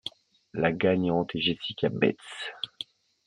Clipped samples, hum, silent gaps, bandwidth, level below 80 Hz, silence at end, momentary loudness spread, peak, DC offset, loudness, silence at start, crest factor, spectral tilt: under 0.1%; none; none; 10.5 kHz; -64 dBFS; 0.45 s; 16 LU; -8 dBFS; under 0.1%; -28 LUFS; 0.05 s; 22 dB; -6.5 dB/octave